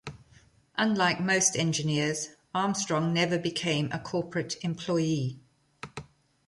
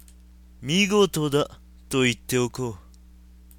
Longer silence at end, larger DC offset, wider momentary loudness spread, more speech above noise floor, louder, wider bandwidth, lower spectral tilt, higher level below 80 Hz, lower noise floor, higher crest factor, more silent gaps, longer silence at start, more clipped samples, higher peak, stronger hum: second, 0.45 s vs 0.8 s; neither; first, 16 LU vs 13 LU; first, 32 dB vs 26 dB; second, -28 LUFS vs -24 LUFS; second, 11.5 kHz vs 17.5 kHz; about the same, -4 dB/octave vs -4.5 dB/octave; second, -64 dBFS vs -48 dBFS; first, -60 dBFS vs -49 dBFS; about the same, 20 dB vs 18 dB; neither; second, 0.05 s vs 0.6 s; neither; about the same, -10 dBFS vs -8 dBFS; neither